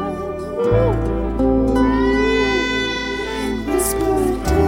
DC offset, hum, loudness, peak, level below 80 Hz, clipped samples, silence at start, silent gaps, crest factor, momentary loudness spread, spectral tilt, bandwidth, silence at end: under 0.1%; none; -18 LUFS; -4 dBFS; -28 dBFS; under 0.1%; 0 s; none; 14 dB; 7 LU; -5.5 dB/octave; 16.5 kHz; 0 s